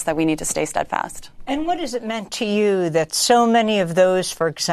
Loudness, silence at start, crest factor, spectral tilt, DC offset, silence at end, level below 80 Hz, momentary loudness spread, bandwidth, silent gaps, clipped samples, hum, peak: -19 LUFS; 0 s; 18 dB; -3.5 dB/octave; under 0.1%; 0 s; -48 dBFS; 11 LU; 13.5 kHz; none; under 0.1%; none; -2 dBFS